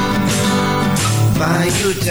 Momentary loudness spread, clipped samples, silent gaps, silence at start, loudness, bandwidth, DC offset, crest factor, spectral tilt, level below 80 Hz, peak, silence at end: 1 LU; under 0.1%; none; 0 s; -15 LUFS; over 20 kHz; under 0.1%; 10 dB; -4.5 dB/octave; -36 dBFS; -4 dBFS; 0 s